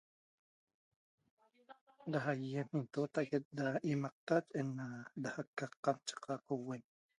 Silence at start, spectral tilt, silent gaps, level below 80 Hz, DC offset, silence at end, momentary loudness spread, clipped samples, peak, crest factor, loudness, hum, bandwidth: 1.7 s; -6.5 dB/octave; 1.81-1.87 s, 3.45-3.51 s, 4.12-4.27 s, 5.47-5.53 s, 5.77-5.83 s; -84 dBFS; under 0.1%; 0.35 s; 8 LU; under 0.1%; -20 dBFS; 22 dB; -41 LUFS; none; 11 kHz